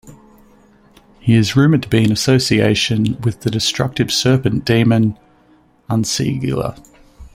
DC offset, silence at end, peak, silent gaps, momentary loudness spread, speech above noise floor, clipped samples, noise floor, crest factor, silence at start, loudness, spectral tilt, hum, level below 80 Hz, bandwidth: under 0.1%; 0.05 s; -2 dBFS; none; 8 LU; 37 dB; under 0.1%; -52 dBFS; 14 dB; 0.05 s; -16 LUFS; -5.5 dB/octave; none; -44 dBFS; 16 kHz